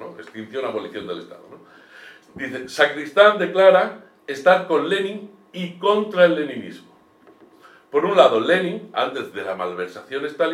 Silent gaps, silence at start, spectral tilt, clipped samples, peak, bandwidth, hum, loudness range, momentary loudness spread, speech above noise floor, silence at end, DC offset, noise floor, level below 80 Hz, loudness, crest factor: none; 0 s; -5 dB/octave; under 0.1%; 0 dBFS; 12.5 kHz; none; 4 LU; 18 LU; 32 dB; 0 s; under 0.1%; -52 dBFS; -74 dBFS; -19 LUFS; 20 dB